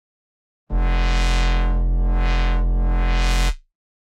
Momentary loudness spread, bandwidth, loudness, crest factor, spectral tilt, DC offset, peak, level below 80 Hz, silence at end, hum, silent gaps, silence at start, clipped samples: 5 LU; 9.6 kHz; -22 LUFS; 14 dB; -5 dB/octave; under 0.1%; -4 dBFS; -20 dBFS; 0.55 s; none; none; 0.7 s; under 0.1%